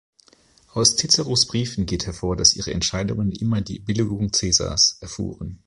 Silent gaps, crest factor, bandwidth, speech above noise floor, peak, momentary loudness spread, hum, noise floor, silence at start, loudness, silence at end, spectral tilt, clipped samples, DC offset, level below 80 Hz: none; 22 dB; 11.5 kHz; 34 dB; -2 dBFS; 10 LU; none; -56 dBFS; 0.75 s; -20 LUFS; 0.1 s; -3 dB/octave; under 0.1%; under 0.1%; -40 dBFS